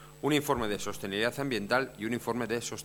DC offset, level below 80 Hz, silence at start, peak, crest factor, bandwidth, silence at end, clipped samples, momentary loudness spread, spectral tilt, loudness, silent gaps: under 0.1%; -58 dBFS; 0 s; -12 dBFS; 20 dB; 19.5 kHz; 0 s; under 0.1%; 6 LU; -4 dB/octave; -31 LUFS; none